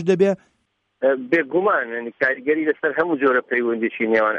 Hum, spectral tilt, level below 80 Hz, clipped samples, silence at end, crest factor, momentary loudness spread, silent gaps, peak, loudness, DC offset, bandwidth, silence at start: none; -7 dB/octave; -68 dBFS; under 0.1%; 0 s; 16 dB; 4 LU; none; -6 dBFS; -20 LUFS; under 0.1%; 8.4 kHz; 0 s